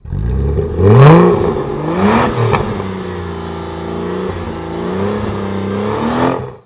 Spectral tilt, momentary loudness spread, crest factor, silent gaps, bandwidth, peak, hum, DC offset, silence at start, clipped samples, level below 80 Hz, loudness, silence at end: -12 dB/octave; 16 LU; 14 dB; none; 4 kHz; 0 dBFS; none; under 0.1%; 0.05 s; 0.2%; -26 dBFS; -14 LUFS; 0.05 s